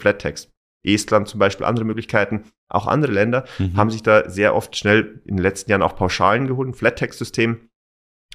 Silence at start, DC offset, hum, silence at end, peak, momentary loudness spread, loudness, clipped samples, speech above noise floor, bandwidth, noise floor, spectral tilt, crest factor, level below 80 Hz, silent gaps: 0 s; under 0.1%; none; 0.75 s; -2 dBFS; 9 LU; -19 LUFS; under 0.1%; over 71 dB; 15 kHz; under -90 dBFS; -5.5 dB/octave; 18 dB; -46 dBFS; 0.57-0.80 s, 2.58-2.67 s